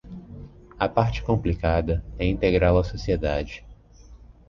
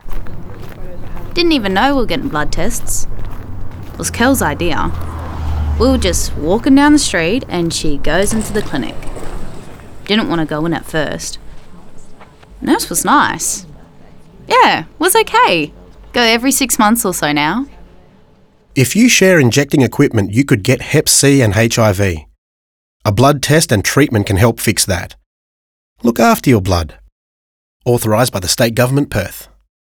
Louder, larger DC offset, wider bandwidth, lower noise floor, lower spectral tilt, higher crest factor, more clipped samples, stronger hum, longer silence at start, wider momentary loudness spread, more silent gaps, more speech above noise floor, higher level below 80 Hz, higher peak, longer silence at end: second, -24 LUFS vs -13 LUFS; neither; second, 7 kHz vs over 20 kHz; about the same, -48 dBFS vs -47 dBFS; first, -8 dB/octave vs -4 dB/octave; first, 20 dB vs 14 dB; neither; neither; about the same, 0.05 s vs 0.05 s; about the same, 21 LU vs 19 LU; second, none vs 22.38-23.00 s, 25.26-25.96 s, 27.12-27.80 s; second, 25 dB vs 35 dB; second, -34 dBFS vs -28 dBFS; second, -4 dBFS vs 0 dBFS; second, 0.15 s vs 0.55 s